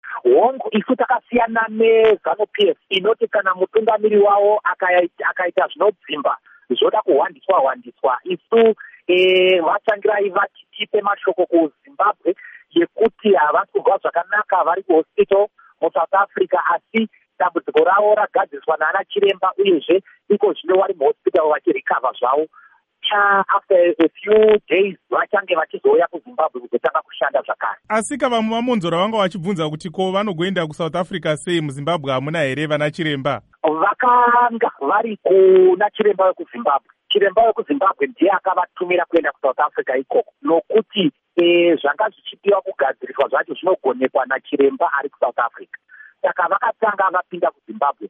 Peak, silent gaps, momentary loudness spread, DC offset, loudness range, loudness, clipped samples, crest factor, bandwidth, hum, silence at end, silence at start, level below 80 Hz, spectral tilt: -4 dBFS; none; 8 LU; under 0.1%; 4 LU; -18 LUFS; under 0.1%; 14 dB; 11 kHz; none; 0 s; 0.05 s; -62 dBFS; -5.5 dB/octave